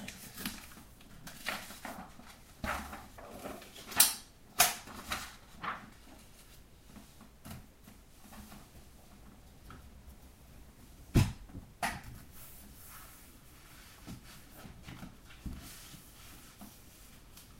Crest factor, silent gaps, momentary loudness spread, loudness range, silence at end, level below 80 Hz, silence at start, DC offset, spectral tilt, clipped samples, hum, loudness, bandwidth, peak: 36 dB; none; 26 LU; 22 LU; 0 s; -52 dBFS; 0 s; under 0.1%; -2.5 dB/octave; under 0.1%; none; -35 LUFS; 16 kHz; -6 dBFS